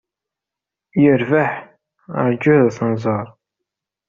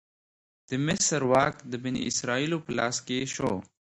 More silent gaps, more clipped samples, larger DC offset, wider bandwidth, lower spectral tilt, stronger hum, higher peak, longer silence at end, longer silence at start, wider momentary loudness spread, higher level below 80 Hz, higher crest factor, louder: neither; neither; neither; second, 7.2 kHz vs 11.5 kHz; first, -7.5 dB/octave vs -3.5 dB/octave; neither; first, -2 dBFS vs -8 dBFS; first, 0.8 s vs 0.35 s; first, 0.95 s vs 0.7 s; first, 13 LU vs 9 LU; about the same, -58 dBFS vs -60 dBFS; about the same, 16 dB vs 20 dB; first, -17 LUFS vs -28 LUFS